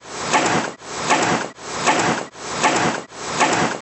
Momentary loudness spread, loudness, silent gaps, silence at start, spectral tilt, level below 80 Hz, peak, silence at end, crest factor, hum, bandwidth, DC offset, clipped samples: 10 LU; -20 LUFS; none; 0.05 s; -3 dB/octave; -56 dBFS; -4 dBFS; 0 s; 18 dB; none; 9 kHz; under 0.1%; under 0.1%